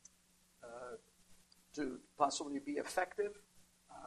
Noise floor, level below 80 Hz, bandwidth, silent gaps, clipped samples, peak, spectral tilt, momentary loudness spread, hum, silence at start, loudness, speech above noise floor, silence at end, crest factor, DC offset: -71 dBFS; -74 dBFS; 14 kHz; none; under 0.1%; -18 dBFS; -3 dB/octave; 20 LU; none; 0.6 s; -41 LUFS; 32 dB; 0 s; 24 dB; under 0.1%